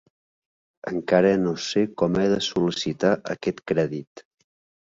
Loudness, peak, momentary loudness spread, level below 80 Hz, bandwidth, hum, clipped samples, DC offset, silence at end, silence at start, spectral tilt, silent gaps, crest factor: -23 LUFS; -6 dBFS; 10 LU; -58 dBFS; 7.8 kHz; none; under 0.1%; under 0.1%; 0.65 s; 0.85 s; -5.5 dB/octave; 4.07-4.15 s; 20 dB